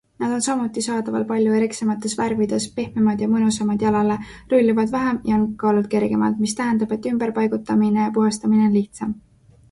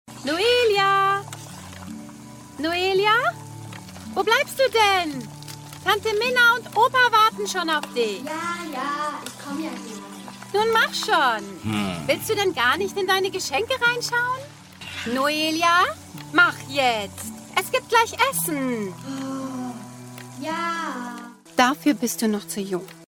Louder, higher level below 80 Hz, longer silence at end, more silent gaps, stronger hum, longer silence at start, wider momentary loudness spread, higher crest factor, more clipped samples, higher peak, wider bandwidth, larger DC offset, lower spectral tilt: about the same, -20 LUFS vs -22 LUFS; first, -52 dBFS vs -62 dBFS; first, 0.5 s vs 0.05 s; neither; neither; first, 0.2 s vs 0.05 s; second, 5 LU vs 19 LU; second, 14 dB vs 20 dB; neither; about the same, -6 dBFS vs -4 dBFS; second, 11.5 kHz vs 18 kHz; neither; first, -5.5 dB/octave vs -3 dB/octave